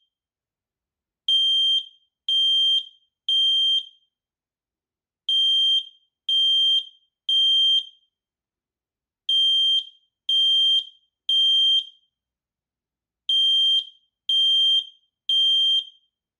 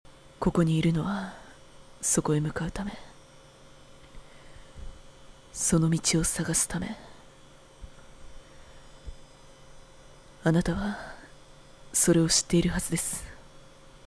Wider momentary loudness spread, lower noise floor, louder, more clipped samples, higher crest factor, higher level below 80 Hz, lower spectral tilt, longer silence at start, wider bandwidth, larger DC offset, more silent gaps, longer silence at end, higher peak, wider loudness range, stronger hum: second, 16 LU vs 26 LU; first, under -90 dBFS vs -52 dBFS; first, -18 LUFS vs -27 LUFS; neither; second, 10 dB vs 20 dB; second, under -90 dBFS vs -46 dBFS; second, 7.5 dB/octave vs -4.5 dB/octave; first, 1.3 s vs 0.1 s; first, 16 kHz vs 11 kHz; neither; neither; first, 0.55 s vs 0.1 s; second, -14 dBFS vs -10 dBFS; second, 2 LU vs 9 LU; neither